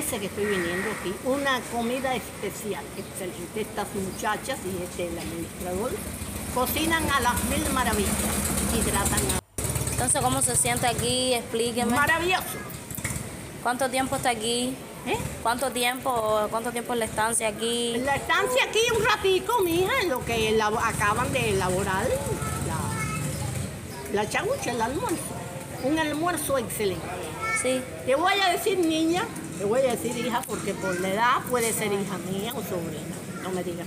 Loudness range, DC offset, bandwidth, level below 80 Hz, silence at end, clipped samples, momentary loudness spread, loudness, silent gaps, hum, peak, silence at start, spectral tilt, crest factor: 6 LU; under 0.1%; 16 kHz; -46 dBFS; 0 s; under 0.1%; 10 LU; -26 LUFS; none; none; -8 dBFS; 0 s; -3.5 dB/octave; 18 dB